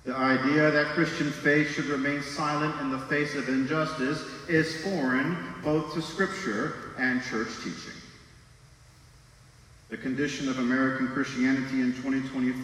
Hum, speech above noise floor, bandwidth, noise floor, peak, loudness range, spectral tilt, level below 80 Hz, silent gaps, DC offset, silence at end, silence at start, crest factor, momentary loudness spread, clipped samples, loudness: none; 27 dB; 12.5 kHz; -54 dBFS; -10 dBFS; 8 LU; -5.5 dB/octave; -60 dBFS; none; under 0.1%; 0 s; 0.05 s; 18 dB; 9 LU; under 0.1%; -28 LUFS